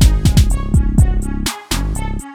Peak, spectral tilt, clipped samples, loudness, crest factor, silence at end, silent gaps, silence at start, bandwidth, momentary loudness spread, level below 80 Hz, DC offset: 0 dBFS; -5.5 dB/octave; under 0.1%; -17 LUFS; 14 dB; 0 s; none; 0 s; 16.5 kHz; 8 LU; -16 dBFS; under 0.1%